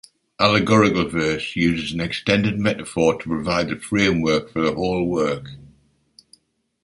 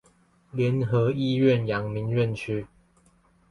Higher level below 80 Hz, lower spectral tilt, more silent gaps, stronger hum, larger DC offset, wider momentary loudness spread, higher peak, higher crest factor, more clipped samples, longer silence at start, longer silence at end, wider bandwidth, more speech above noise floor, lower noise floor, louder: first, -46 dBFS vs -56 dBFS; second, -5.5 dB/octave vs -8.5 dB/octave; neither; neither; neither; second, 8 LU vs 11 LU; first, -2 dBFS vs -8 dBFS; about the same, 18 dB vs 18 dB; neither; second, 0.4 s vs 0.55 s; first, 1.15 s vs 0.85 s; about the same, 11.5 kHz vs 11 kHz; about the same, 37 dB vs 37 dB; second, -57 dBFS vs -61 dBFS; first, -20 LUFS vs -25 LUFS